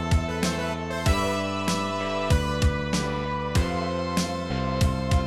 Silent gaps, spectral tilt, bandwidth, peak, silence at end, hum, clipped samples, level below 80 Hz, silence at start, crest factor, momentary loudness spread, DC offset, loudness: none; -5.5 dB/octave; 15.5 kHz; -8 dBFS; 0 s; none; under 0.1%; -32 dBFS; 0 s; 16 dB; 4 LU; 0.4%; -26 LUFS